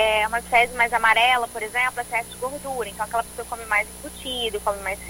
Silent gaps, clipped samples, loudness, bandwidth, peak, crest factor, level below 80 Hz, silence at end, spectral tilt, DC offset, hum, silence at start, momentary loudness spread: none; under 0.1%; -22 LUFS; 17 kHz; -4 dBFS; 20 dB; -46 dBFS; 0 s; -1.5 dB/octave; under 0.1%; 60 Hz at -50 dBFS; 0 s; 13 LU